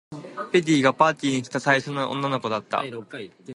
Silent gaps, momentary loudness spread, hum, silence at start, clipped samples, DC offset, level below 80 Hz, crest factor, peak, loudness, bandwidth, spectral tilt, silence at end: none; 17 LU; none; 0.1 s; under 0.1%; under 0.1%; -70 dBFS; 22 dB; -2 dBFS; -23 LUFS; 11.5 kHz; -5 dB/octave; 0 s